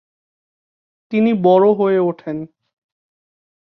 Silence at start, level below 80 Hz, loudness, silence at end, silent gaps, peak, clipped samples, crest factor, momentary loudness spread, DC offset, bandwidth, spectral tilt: 1.1 s; -66 dBFS; -15 LUFS; 1.3 s; none; -2 dBFS; under 0.1%; 16 dB; 15 LU; under 0.1%; 5.8 kHz; -10 dB/octave